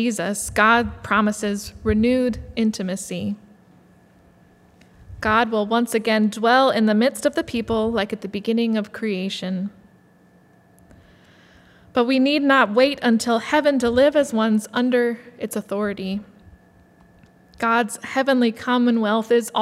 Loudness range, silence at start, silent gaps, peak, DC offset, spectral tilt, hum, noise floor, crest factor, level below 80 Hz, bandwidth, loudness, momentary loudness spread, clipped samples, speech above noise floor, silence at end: 8 LU; 0 s; none; -2 dBFS; under 0.1%; -4.5 dB/octave; none; -54 dBFS; 20 dB; -48 dBFS; 15 kHz; -20 LUFS; 11 LU; under 0.1%; 34 dB; 0 s